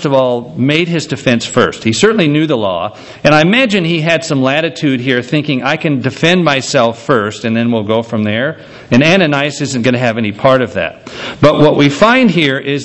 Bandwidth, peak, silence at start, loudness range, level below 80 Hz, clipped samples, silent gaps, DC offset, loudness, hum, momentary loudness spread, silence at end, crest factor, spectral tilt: 8.4 kHz; 0 dBFS; 0 s; 2 LU; -46 dBFS; 0.3%; none; under 0.1%; -12 LUFS; none; 7 LU; 0 s; 12 dB; -5.5 dB/octave